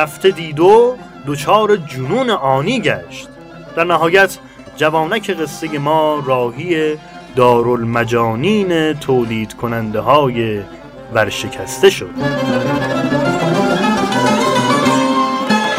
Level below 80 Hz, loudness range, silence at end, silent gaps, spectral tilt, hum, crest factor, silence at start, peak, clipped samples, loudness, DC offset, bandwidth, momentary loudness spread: -46 dBFS; 2 LU; 0 s; none; -5 dB/octave; none; 14 dB; 0 s; 0 dBFS; under 0.1%; -15 LUFS; under 0.1%; 16 kHz; 10 LU